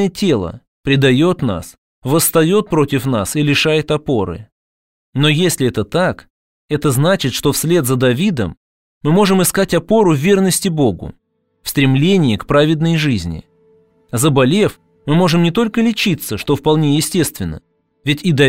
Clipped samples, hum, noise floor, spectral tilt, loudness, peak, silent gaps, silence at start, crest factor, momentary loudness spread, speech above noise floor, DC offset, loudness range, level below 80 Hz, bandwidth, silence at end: under 0.1%; none; -53 dBFS; -5 dB/octave; -15 LUFS; -2 dBFS; 0.68-0.83 s, 1.78-2.02 s, 4.52-5.13 s, 6.30-6.68 s, 8.57-9.01 s; 0 s; 14 dB; 12 LU; 39 dB; 0.5%; 2 LU; -42 dBFS; 16.5 kHz; 0 s